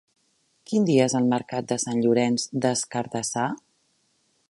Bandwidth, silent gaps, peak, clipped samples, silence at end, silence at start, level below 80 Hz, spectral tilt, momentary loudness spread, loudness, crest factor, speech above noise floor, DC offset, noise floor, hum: 11.5 kHz; none; -6 dBFS; under 0.1%; 0.95 s; 0.7 s; -68 dBFS; -4.5 dB/octave; 8 LU; -24 LUFS; 20 dB; 45 dB; under 0.1%; -68 dBFS; none